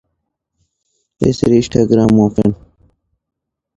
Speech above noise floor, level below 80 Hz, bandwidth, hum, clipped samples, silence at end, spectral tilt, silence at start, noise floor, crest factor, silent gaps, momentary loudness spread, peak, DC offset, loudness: 61 dB; -40 dBFS; 10 kHz; none; under 0.1%; 1.2 s; -7.5 dB/octave; 1.2 s; -73 dBFS; 16 dB; none; 7 LU; 0 dBFS; under 0.1%; -13 LUFS